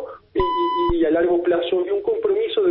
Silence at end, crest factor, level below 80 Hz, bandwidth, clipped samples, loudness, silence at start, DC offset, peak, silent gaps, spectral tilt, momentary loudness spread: 0 s; 12 dB; -40 dBFS; 5.2 kHz; under 0.1%; -20 LUFS; 0 s; under 0.1%; -6 dBFS; none; -10.5 dB/octave; 4 LU